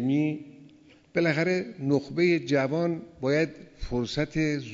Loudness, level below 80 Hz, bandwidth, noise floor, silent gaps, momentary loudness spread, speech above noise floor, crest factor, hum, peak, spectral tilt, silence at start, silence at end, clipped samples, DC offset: -27 LUFS; -50 dBFS; 7.8 kHz; -55 dBFS; none; 7 LU; 28 dB; 16 dB; none; -12 dBFS; -6.5 dB/octave; 0 s; 0 s; under 0.1%; under 0.1%